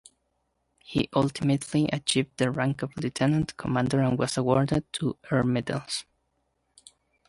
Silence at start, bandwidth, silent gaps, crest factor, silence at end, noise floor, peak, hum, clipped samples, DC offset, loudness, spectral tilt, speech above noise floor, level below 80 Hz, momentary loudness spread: 0.9 s; 11.5 kHz; none; 20 dB; 1.25 s; -75 dBFS; -8 dBFS; none; under 0.1%; under 0.1%; -27 LUFS; -5.5 dB/octave; 49 dB; -54 dBFS; 7 LU